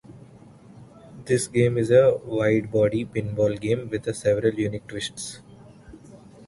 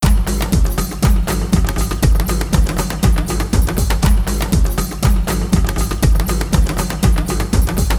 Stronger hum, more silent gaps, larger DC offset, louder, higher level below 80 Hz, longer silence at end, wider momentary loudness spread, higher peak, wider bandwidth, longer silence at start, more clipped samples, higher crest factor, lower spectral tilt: neither; neither; neither; second, -23 LUFS vs -17 LUFS; second, -54 dBFS vs -16 dBFS; about the same, 0.05 s vs 0 s; first, 14 LU vs 2 LU; second, -6 dBFS vs -2 dBFS; second, 11.5 kHz vs over 20 kHz; about the same, 0.1 s vs 0 s; neither; first, 20 dB vs 14 dB; about the same, -6 dB/octave vs -5.5 dB/octave